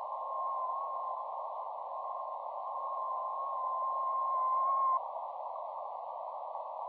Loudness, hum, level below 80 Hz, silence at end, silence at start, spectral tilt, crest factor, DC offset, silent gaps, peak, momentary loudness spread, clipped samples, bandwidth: -36 LUFS; none; under -90 dBFS; 0 s; 0 s; -4.5 dB/octave; 12 dB; under 0.1%; none; -24 dBFS; 10 LU; under 0.1%; 4.5 kHz